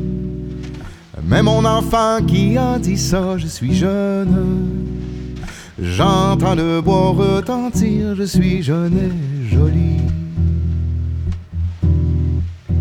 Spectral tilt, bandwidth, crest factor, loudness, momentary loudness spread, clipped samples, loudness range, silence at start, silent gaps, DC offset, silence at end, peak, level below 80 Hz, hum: -7 dB/octave; 16.5 kHz; 16 dB; -17 LUFS; 12 LU; under 0.1%; 3 LU; 0 s; none; under 0.1%; 0 s; 0 dBFS; -26 dBFS; none